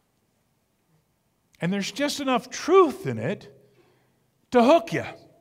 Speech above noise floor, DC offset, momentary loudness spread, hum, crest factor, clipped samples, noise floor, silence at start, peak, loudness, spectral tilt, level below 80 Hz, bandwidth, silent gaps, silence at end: 48 dB; under 0.1%; 13 LU; none; 20 dB; under 0.1%; -70 dBFS; 1.6 s; -6 dBFS; -23 LUFS; -5 dB/octave; -66 dBFS; 15.5 kHz; none; 0.25 s